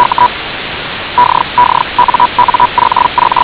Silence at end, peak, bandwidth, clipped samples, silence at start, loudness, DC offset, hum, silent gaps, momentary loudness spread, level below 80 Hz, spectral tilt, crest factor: 0 s; 0 dBFS; 4 kHz; 3%; 0 s; -10 LUFS; under 0.1%; none; none; 9 LU; -38 dBFS; -7.5 dB/octave; 10 dB